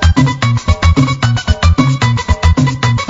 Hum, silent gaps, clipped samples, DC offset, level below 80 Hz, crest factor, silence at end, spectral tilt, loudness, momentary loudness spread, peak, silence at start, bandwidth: none; none; 0.2%; under 0.1%; -20 dBFS; 10 dB; 0 s; -6 dB/octave; -12 LUFS; 3 LU; 0 dBFS; 0 s; 7.8 kHz